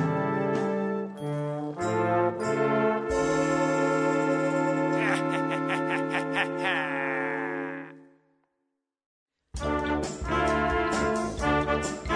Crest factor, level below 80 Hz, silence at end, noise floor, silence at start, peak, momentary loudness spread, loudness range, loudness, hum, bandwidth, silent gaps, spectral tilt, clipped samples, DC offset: 18 dB; -46 dBFS; 0 s; -81 dBFS; 0 s; -10 dBFS; 7 LU; 7 LU; -27 LUFS; none; 11 kHz; 9.06-9.26 s; -5.5 dB/octave; under 0.1%; under 0.1%